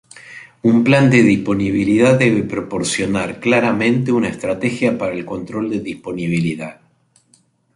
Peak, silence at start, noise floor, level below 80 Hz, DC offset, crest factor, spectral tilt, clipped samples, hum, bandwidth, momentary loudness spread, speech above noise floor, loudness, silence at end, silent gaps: -2 dBFS; 0.15 s; -57 dBFS; -50 dBFS; under 0.1%; 16 dB; -6 dB/octave; under 0.1%; none; 11.5 kHz; 14 LU; 41 dB; -16 LUFS; 1.05 s; none